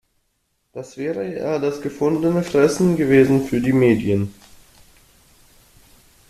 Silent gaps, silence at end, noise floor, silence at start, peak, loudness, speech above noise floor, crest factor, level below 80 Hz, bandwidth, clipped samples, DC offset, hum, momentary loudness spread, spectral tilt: none; 1.95 s; -69 dBFS; 0.75 s; -2 dBFS; -19 LUFS; 51 dB; 18 dB; -52 dBFS; 14 kHz; under 0.1%; under 0.1%; none; 14 LU; -7 dB/octave